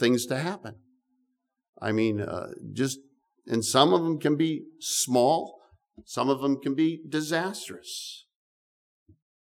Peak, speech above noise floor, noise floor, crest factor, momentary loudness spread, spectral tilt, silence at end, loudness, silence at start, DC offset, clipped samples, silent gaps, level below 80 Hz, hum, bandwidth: -4 dBFS; 50 dB; -77 dBFS; 24 dB; 15 LU; -4 dB/octave; 1.3 s; -27 LUFS; 0 s; under 0.1%; under 0.1%; 1.69-1.73 s; -72 dBFS; none; 18 kHz